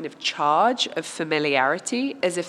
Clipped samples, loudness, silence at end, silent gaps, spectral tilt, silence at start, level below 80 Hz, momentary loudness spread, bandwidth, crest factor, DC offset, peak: under 0.1%; -22 LUFS; 0 s; none; -3 dB/octave; 0 s; -82 dBFS; 7 LU; 13 kHz; 18 dB; under 0.1%; -4 dBFS